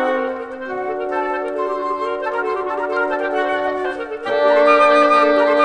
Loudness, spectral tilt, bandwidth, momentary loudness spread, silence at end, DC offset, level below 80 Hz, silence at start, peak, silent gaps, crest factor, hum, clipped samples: -18 LUFS; -4 dB/octave; 9.6 kHz; 12 LU; 0 s; under 0.1%; -56 dBFS; 0 s; -2 dBFS; none; 16 dB; none; under 0.1%